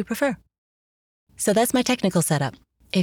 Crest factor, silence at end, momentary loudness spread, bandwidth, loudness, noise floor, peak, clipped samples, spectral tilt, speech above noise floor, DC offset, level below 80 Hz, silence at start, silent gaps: 16 dB; 0 s; 8 LU; over 20 kHz; -22 LUFS; under -90 dBFS; -8 dBFS; under 0.1%; -4.5 dB/octave; over 68 dB; under 0.1%; -58 dBFS; 0 s; 0.58-1.27 s